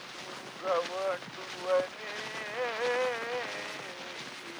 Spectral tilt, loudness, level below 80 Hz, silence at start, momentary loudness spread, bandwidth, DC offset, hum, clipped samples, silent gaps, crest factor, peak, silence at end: -2.5 dB/octave; -34 LUFS; -78 dBFS; 0 s; 10 LU; over 20 kHz; under 0.1%; none; under 0.1%; none; 18 dB; -16 dBFS; 0 s